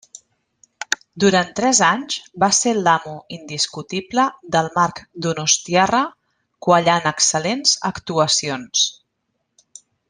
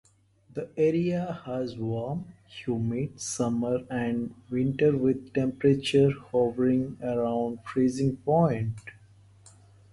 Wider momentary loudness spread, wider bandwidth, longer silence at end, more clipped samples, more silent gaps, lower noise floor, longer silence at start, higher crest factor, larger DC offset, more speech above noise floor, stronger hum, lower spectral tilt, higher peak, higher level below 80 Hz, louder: about the same, 11 LU vs 11 LU; about the same, 12 kHz vs 11.5 kHz; first, 1.15 s vs 1 s; neither; neither; first, -73 dBFS vs -60 dBFS; first, 0.8 s vs 0.55 s; about the same, 20 dB vs 18 dB; neither; first, 55 dB vs 33 dB; neither; second, -2.5 dB/octave vs -6.5 dB/octave; first, 0 dBFS vs -10 dBFS; about the same, -58 dBFS vs -58 dBFS; first, -18 LUFS vs -27 LUFS